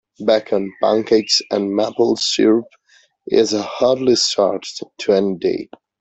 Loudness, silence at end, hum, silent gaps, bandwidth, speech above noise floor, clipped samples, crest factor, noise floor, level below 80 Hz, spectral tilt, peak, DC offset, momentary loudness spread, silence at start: -17 LUFS; 0.35 s; none; none; 8.4 kHz; 22 dB; under 0.1%; 16 dB; -39 dBFS; -60 dBFS; -3.5 dB/octave; -2 dBFS; under 0.1%; 7 LU; 0.2 s